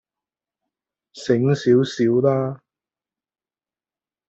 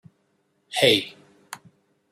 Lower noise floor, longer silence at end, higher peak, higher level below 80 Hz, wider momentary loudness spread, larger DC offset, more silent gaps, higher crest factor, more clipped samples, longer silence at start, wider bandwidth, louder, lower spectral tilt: first, under -90 dBFS vs -69 dBFS; first, 1.7 s vs 0.55 s; about the same, -4 dBFS vs -4 dBFS; first, -64 dBFS vs -72 dBFS; second, 13 LU vs 23 LU; neither; neither; about the same, 18 dB vs 22 dB; neither; first, 1.15 s vs 0.7 s; second, 8 kHz vs 16 kHz; about the same, -19 LUFS vs -20 LUFS; first, -7.5 dB/octave vs -3 dB/octave